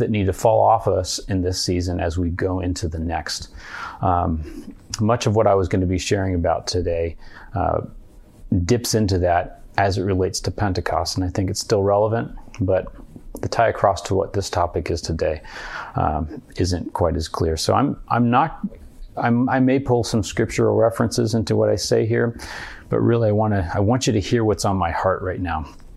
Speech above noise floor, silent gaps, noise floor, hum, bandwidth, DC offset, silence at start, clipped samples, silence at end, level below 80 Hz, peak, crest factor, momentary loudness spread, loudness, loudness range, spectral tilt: 21 dB; none; -42 dBFS; none; 13 kHz; under 0.1%; 0 s; under 0.1%; 0 s; -40 dBFS; 0 dBFS; 20 dB; 11 LU; -21 LUFS; 4 LU; -5.5 dB/octave